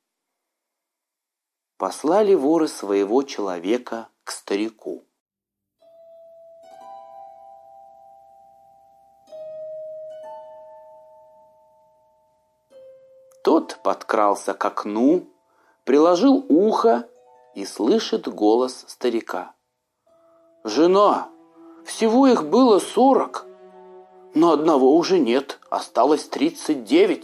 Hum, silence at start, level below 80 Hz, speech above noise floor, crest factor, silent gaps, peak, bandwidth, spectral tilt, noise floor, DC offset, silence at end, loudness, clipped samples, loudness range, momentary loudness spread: none; 1.8 s; -78 dBFS; 66 dB; 18 dB; 5.20-5.26 s; -4 dBFS; 14.5 kHz; -5 dB/octave; -85 dBFS; under 0.1%; 0 s; -20 LUFS; under 0.1%; 21 LU; 20 LU